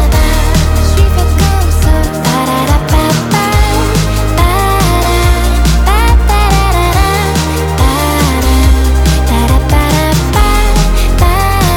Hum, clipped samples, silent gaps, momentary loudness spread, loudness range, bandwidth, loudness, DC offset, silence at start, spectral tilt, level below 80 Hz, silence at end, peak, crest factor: none; under 0.1%; none; 2 LU; 1 LU; 19 kHz; -10 LUFS; under 0.1%; 0 s; -5 dB/octave; -10 dBFS; 0 s; 0 dBFS; 8 dB